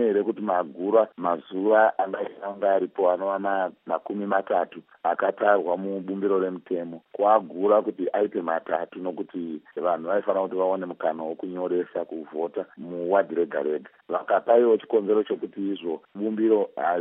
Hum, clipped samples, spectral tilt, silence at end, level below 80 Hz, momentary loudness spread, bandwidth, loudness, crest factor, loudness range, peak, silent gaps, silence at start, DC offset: none; under 0.1%; -10 dB/octave; 0 s; -86 dBFS; 11 LU; 3.9 kHz; -25 LUFS; 18 dB; 4 LU; -6 dBFS; none; 0 s; under 0.1%